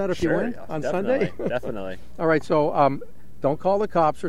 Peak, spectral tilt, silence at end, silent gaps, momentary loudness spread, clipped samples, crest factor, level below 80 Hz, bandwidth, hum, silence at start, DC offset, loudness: -6 dBFS; -7 dB/octave; 0 s; none; 10 LU; under 0.1%; 18 dB; -50 dBFS; 14 kHz; none; 0 s; 3%; -24 LUFS